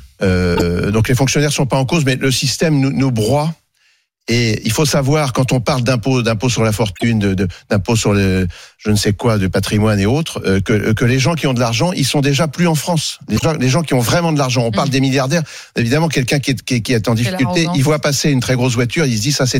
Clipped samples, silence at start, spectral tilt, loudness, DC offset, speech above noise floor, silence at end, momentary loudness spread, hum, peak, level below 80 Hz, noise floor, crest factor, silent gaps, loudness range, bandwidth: under 0.1%; 0 s; -5 dB/octave; -15 LUFS; under 0.1%; 44 dB; 0 s; 4 LU; none; 0 dBFS; -38 dBFS; -59 dBFS; 14 dB; none; 1 LU; 16.5 kHz